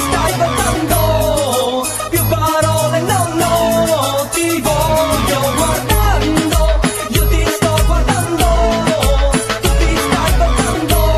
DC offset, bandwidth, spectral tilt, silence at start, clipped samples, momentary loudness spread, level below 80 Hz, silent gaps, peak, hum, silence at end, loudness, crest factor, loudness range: under 0.1%; 14.5 kHz; -4.5 dB/octave; 0 s; under 0.1%; 2 LU; -18 dBFS; none; 0 dBFS; none; 0 s; -14 LUFS; 14 dB; 0 LU